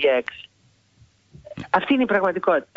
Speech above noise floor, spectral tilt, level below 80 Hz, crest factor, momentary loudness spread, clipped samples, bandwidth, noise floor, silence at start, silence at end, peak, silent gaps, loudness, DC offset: 38 dB; -6.5 dB/octave; -60 dBFS; 16 dB; 20 LU; under 0.1%; 7.6 kHz; -59 dBFS; 0 s; 0.15 s; -6 dBFS; none; -21 LUFS; under 0.1%